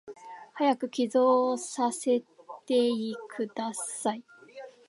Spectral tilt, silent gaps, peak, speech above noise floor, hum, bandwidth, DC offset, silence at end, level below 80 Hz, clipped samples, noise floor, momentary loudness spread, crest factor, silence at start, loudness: -3.5 dB/octave; none; -12 dBFS; 20 dB; none; 11.5 kHz; under 0.1%; 0.2 s; -86 dBFS; under 0.1%; -48 dBFS; 22 LU; 18 dB; 0.05 s; -28 LUFS